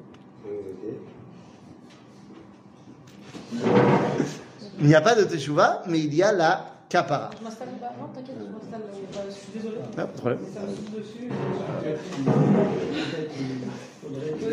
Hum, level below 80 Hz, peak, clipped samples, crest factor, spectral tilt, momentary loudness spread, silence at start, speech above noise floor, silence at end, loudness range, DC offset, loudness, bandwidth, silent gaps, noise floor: none; -66 dBFS; -4 dBFS; under 0.1%; 22 dB; -6.5 dB/octave; 17 LU; 0 s; 23 dB; 0 s; 12 LU; under 0.1%; -25 LUFS; 10.5 kHz; none; -48 dBFS